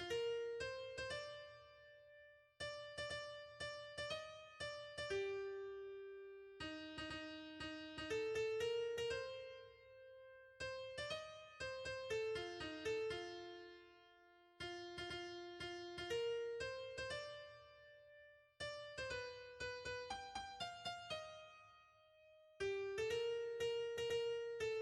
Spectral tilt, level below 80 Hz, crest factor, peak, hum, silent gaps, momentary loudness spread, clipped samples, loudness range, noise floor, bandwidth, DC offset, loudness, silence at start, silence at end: -3.5 dB/octave; -72 dBFS; 16 dB; -32 dBFS; none; none; 19 LU; under 0.1%; 5 LU; -69 dBFS; 12.5 kHz; under 0.1%; -47 LUFS; 0 s; 0 s